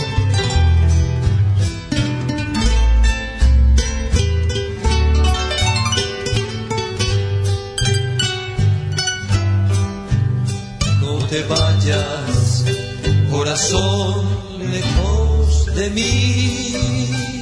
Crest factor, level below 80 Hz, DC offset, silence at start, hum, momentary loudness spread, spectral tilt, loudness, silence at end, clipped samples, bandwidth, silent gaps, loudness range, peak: 12 dB; -20 dBFS; under 0.1%; 0 s; none; 5 LU; -5 dB/octave; -18 LUFS; 0 s; under 0.1%; 11 kHz; none; 2 LU; -4 dBFS